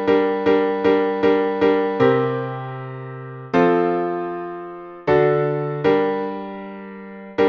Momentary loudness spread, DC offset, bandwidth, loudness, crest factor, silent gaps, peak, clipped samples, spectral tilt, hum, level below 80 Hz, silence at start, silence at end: 16 LU; under 0.1%; 6.2 kHz; -19 LUFS; 16 dB; none; -4 dBFS; under 0.1%; -8.5 dB/octave; none; -56 dBFS; 0 s; 0 s